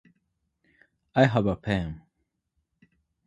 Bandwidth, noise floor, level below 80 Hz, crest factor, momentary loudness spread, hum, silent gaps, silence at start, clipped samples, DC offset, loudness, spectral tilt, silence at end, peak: 11 kHz; -78 dBFS; -50 dBFS; 24 dB; 15 LU; none; none; 1.15 s; under 0.1%; under 0.1%; -26 LUFS; -7.5 dB/octave; 1.3 s; -6 dBFS